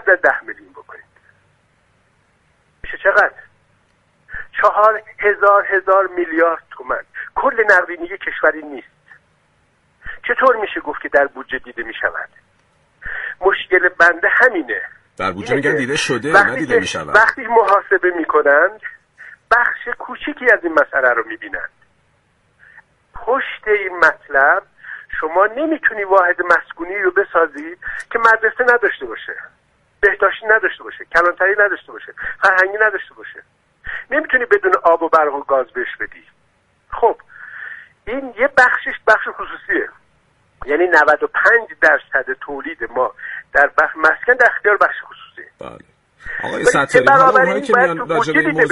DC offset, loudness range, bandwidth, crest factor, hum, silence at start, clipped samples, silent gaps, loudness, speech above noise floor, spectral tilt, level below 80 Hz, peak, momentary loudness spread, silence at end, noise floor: under 0.1%; 5 LU; 11.5 kHz; 16 dB; none; 0.05 s; under 0.1%; none; -15 LUFS; 44 dB; -4 dB/octave; -50 dBFS; 0 dBFS; 17 LU; 0 s; -59 dBFS